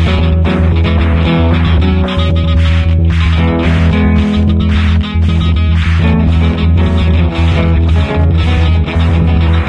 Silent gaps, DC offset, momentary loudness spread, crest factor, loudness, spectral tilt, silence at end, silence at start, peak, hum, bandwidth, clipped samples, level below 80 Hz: none; under 0.1%; 1 LU; 8 dB; -11 LUFS; -8 dB/octave; 0 s; 0 s; 0 dBFS; none; 5.8 kHz; under 0.1%; -18 dBFS